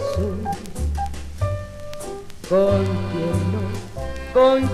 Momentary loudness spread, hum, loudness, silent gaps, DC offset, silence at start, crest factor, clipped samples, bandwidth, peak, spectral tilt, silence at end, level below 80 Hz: 16 LU; none; -22 LUFS; none; under 0.1%; 0 s; 18 dB; under 0.1%; 13.5 kHz; -4 dBFS; -7 dB/octave; 0 s; -34 dBFS